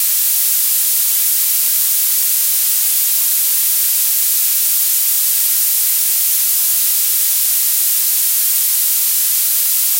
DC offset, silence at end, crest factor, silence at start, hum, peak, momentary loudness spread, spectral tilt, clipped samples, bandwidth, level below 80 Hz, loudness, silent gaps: under 0.1%; 0 s; 12 dB; 0 s; none; -2 dBFS; 0 LU; 6 dB/octave; under 0.1%; 16.5 kHz; -82 dBFS; -11 LUFS; none